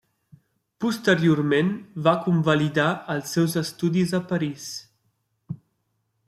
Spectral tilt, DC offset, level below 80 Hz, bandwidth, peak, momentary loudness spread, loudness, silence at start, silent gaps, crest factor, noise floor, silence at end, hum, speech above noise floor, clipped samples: -6 dB/octave; under 0.1%; -64 dBFS; 15 kHz; -4 dBFS; 16 LU; -23 LUFS; 0.8 s; none; 20 dB; -73 dBFS; 0.75 s; none; 51 dB; under 0.1%